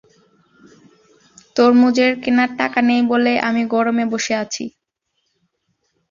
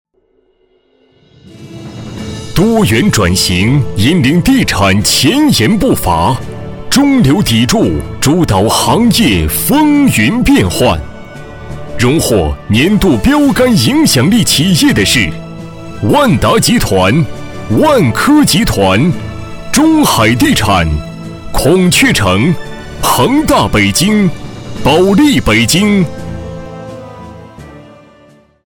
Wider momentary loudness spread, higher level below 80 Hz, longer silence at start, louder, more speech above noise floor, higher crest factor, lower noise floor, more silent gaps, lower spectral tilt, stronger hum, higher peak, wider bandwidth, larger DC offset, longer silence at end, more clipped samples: second, 11 LU vs 18 LU; second, -62 dBFS vs -28 dBFS; about the same, 1.55 s vs 1.55 s; second, -16 LUFS vs -9 LUFS; first, 57 dB vs 46 dB; first, 16 dB vs 10 dB; first, -73 dBFS vs -55 dBFS; neither; about the same, -4 dB/octave vs -4.5 dB/octave; neither; about the same, -2 dBFS vs 0 dBFS; second, 7.4 kHz vs over 20 kHz; neither; first, 1.4 s vs 0.8 s; neither